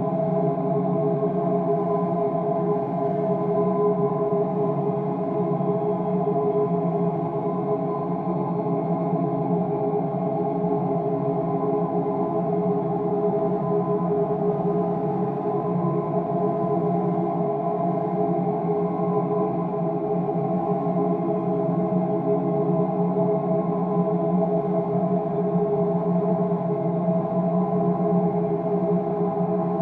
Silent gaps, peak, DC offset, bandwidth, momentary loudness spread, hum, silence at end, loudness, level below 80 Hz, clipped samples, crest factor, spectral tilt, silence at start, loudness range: none; -10 dBFS; under 0.1%; 3.8 kHz; 2 LU; none; 0 s; -24 LUFS; -60 dBFS; under 0.1%; 12 dB; -12.5 dB/octave; 0 s; 1 LU